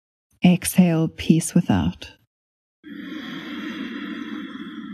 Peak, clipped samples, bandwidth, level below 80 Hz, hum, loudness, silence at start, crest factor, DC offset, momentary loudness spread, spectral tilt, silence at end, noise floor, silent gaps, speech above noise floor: -2 dBFS; under 0.1%; 13 kHz; -48 dBFS; none; -22 LUFS; 0.4 s; 20 dB; under 0.1%; 17 LU; -6 dB/octave; 0 s; under -90 dBFS; 2.27-2.83 s; over 71 dB